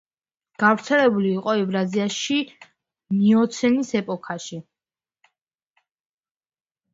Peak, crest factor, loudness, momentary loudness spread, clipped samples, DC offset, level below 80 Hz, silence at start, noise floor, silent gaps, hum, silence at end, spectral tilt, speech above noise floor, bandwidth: -4 dBFS; 20 dB; -21 LUFS; 14 LU; under 0.1%; under 0.1%; -66 dBFS; 0.6 s; under -90 dBFS; none; none; 2.35 s; -5 dB/octave; over 69 dB; 7.8 kHz